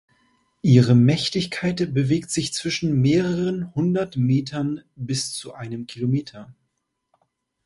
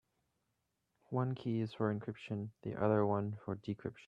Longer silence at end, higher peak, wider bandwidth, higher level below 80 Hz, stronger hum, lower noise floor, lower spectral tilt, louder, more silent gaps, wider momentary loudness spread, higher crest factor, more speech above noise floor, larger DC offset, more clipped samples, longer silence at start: first, 1.15 s vs 0.05 s; first, -2 dBFS vs -18 dBFS; first, 11.5 kHz vs 7.6 kHz; first, -54 dBFS vs -74 dBFS; neither; second, -76 dBFS vs -84 dBFS; second, -6 dB/octave vs -9.5 dB/octave; first, -22 LUFS vs -38 LUFS; neither; first, 13 LU vs 10 LU; about the same, 20 dB vs 20 dB; first, 55 dB vs 47 dB; neither; neither; second, 0.65 s vs 1.1 s